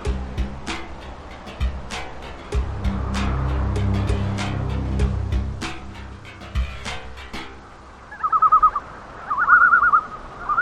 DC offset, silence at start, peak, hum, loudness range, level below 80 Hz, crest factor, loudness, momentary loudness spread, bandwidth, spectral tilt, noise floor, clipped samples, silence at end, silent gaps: under 0.1%; 0 s; -2 dBFS; none; 11 LU; -30 dBFS; 20 dB; -21 LUFS; 22 LU; 11 kHz; -5.5 dB/octave; -42 dBFS; under 0.1%; 0 s; none